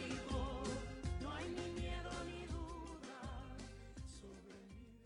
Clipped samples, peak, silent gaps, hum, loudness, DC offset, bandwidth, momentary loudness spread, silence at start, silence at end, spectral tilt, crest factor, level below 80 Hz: under 0.1%; -32 dBFS; none; none; -47 LUFS; under 0.1%; 11.5 kHz; 13 LU; 0 s; 0 s; -5.5 dB/octave; 16 dB; -52 dBFS